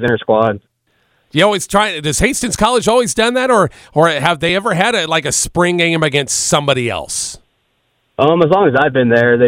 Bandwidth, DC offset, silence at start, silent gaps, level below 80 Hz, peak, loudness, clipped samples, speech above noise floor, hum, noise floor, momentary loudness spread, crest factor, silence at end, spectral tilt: 16.5 kHz; under 0.1%; 0 s; none; -40 dBFS; 0 dBFS; -13 LUFS; under 0.1%; 49 dB; none; -63 dBFS; 6 LU; 14 dB; 0 s; -3.5 dB/octave